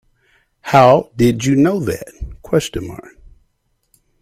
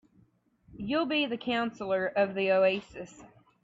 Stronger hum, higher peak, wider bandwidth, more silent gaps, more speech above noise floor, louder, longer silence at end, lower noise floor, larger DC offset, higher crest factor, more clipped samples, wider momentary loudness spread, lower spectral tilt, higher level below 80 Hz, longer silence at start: neither; first, 0 dBFS vs -14 dBFS; first, 16 kHz vs 7.8 kHz; neither; first, 51 dB vs 37 dB; first, -15 LUFS vs -29 LUFS; first, 1.25 s vs 0.35 s; about the same, -65 dBFS vs -66 dBFS; neither; about the same, 18 dB vs 16 dB; neither; first, 22 LU vs 18 LU; about the same, -6 dB/octave vs -5.5 dB/octave; first, -40 dBFS vs -64 dBFS; about the same, 0.65 s vs 0.7 s